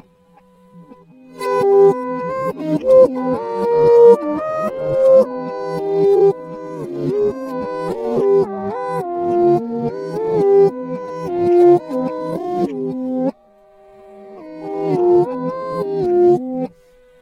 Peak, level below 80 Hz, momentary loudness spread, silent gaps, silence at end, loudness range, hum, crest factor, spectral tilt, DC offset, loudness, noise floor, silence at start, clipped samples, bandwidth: 0 dBFS; -54 dBFS; 13 LU; none; 0.55 s; 7 LU; none; 16 dB; -8.5 dB/octave; under 0.1%; -16 LUFS; -51 dBFS; 0.75 s; under 0.1%; 12 kHz